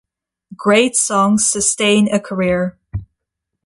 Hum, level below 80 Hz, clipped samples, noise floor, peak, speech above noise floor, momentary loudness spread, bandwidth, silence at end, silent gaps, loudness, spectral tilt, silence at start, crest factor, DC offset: none; -44 dBFS; under 0.1%; -78 dBFS; -2 dBFS; 63 dB; 14 LU; 11.5 kHz; 0.6 s; none; -15 LUFS; -3.5 dB/octave; 0.5 s; 16 dB; under 0.1%